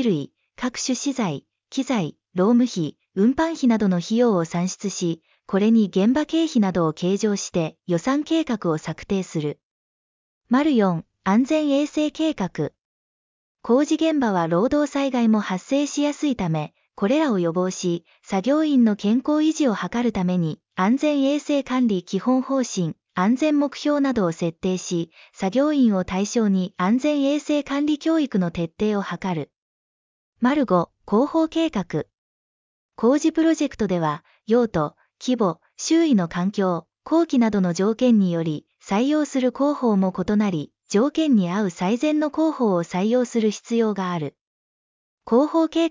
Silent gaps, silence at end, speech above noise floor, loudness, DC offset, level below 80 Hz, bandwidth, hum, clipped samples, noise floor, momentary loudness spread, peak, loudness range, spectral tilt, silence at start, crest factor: 9.63-10.41 s, 12.85-13.55 s, 29.58-30.33 s, 32.18-32.89 s, 44.41-45.18 s; 0 s; over 69 dB; -22 LUFS; under 0.1%; -56 dBFS; 7.6 kHz; none; under 0.1%; under -90 dBFS; 9 LU; -6 dBFS; 3 LU; -6 dB/octave; 0 s; 16 dB